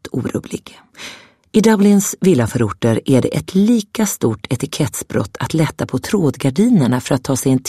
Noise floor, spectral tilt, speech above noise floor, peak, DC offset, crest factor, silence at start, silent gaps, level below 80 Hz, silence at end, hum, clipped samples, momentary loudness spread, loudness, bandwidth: -37 dBFS; -6 dB/octave; 21 dB; 0 dBFS; under 0.1%; 16 dB; 0.05 s; none; -48 dBFS; 0 s; none; under 0.1%; 10 LU; -16 LUFS; 15 kHz